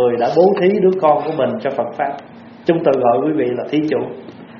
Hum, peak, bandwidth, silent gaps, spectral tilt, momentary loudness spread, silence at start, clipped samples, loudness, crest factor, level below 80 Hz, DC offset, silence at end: none; 0 dBFS; 6.6 kHz; none; -6 dB/octave; 10 LU; 0 s; under 0.1%; -16 LUFS; 16 dB; -62 dBFS; under 0.1%; 0 s